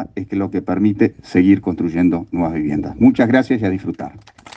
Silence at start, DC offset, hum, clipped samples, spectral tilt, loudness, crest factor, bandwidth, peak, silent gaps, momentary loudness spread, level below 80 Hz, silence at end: 0 s; under 0.1%; none; under 0.1%; -8.5 dB/octave; -17 LUFS; 16 dB; 7.6 kHz; 0 dBFS; none; 10 LU; -48 dBFS; 0.4 s